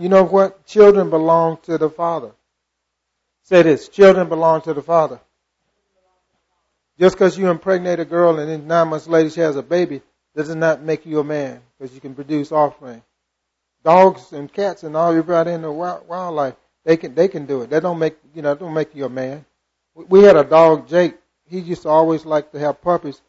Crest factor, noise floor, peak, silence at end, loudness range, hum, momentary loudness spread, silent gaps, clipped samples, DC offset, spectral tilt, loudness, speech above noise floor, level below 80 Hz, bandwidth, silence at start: 16 dB; -76 dBFS; 0 dBFS; 0.15 s; 7 LU; none; 15 LU; none; under 0.1%; under 0.1%; -7 dB/octave; -16 LUFS; 60 dB; -56 dBFS; 8 kHz; 0 s